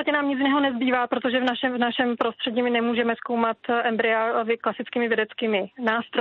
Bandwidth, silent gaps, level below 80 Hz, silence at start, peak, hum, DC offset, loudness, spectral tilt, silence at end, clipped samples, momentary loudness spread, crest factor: 5.8 kHz; none; -72 dBFS; 0 s; -8 dBFS; none; under 0.1%; -24 LUFS; -1.5 dB/octave; 0 s; under 0.1%; 4 LU; 14 dB